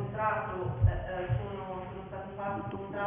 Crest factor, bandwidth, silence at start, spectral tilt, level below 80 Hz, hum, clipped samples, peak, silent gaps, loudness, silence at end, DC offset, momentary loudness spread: 18 dB; 3.7 kHz; 0 s; -7 dB/octave; -42 dBFS; none; under 0.1%; -14 dBFS; none; -34 LUFS; 0 s; under 0.1%; 11 LU